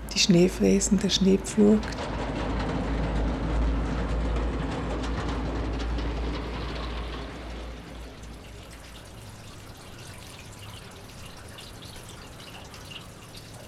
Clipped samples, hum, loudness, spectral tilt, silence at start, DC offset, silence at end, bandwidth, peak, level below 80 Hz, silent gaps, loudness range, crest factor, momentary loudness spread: under 0.1%; none; -27 LUFS; -5 dB/octave; 0 s; under 0.1%; 0 s; 13.5 kHz; -8 dBFS; -34 dBFS; none; 18 LU; 20 dB; 22 LU